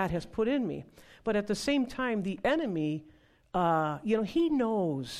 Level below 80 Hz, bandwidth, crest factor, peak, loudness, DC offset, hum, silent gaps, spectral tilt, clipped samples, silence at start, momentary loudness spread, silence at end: -56 dBFS; 14 kHz; 14 dB; -16 dBFS; -30 LUFS; under 0.1%; none; none; -6 dB/octave; under 0.1%; 0 s; 8 LU; 0 s